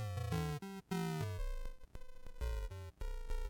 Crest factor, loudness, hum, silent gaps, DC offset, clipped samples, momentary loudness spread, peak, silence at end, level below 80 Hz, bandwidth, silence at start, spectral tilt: 12 dB; -44 LUFS; none; none; under 0.1%; under 0.1%; 18 LU; -28 dBFS; 0 s; -44 dBFS; 17 kHz; 0 s; -6 dB/octave